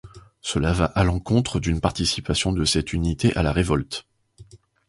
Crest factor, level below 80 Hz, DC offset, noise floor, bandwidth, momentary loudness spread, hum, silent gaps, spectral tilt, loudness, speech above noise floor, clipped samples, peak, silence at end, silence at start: 20 dB; -34 dBFS; under 0.1%; -49 dBFS; 11.5 kHz; 5 LU; none; none; -5 dB/octave; -23 LUFS; 27 dB; under 0.1%; -2 dBFS; 0.3 s; 0.05 s